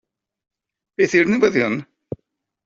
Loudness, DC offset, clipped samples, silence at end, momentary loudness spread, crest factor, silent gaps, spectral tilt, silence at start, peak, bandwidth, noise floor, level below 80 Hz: -18 LUFS; under 0.1%; under 0.1%; 0.8 s; 20 LU; 18 dB; none; -5.5 dB/octave; 1 s; -2 dBFS; 7.8 kHz; -71 dBFS; -60 dBFS